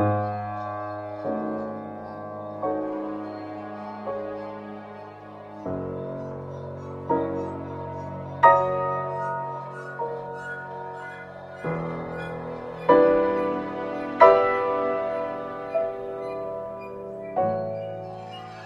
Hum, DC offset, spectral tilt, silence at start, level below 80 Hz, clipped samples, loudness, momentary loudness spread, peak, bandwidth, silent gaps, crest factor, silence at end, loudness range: none; under 0.1%; -8 dB/octave; 0 s; -58 dBFS; under 0.1%; -26 LUFS; 18 LU; 0 dBFS; 7.6 kHz; none; 26 dB; 0 s; 12 LU